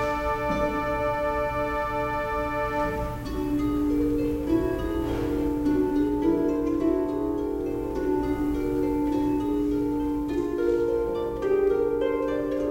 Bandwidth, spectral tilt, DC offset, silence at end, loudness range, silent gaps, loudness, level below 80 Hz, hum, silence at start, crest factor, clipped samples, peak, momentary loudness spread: 16.5 kHz; -7.5 dB/octave; under 0.1%; 0 s; 2 LU; none; -26 LUFS; -38 dBFS; none; 0 s; 14 dB; under 0.1%; -12 dBFS; 4 LU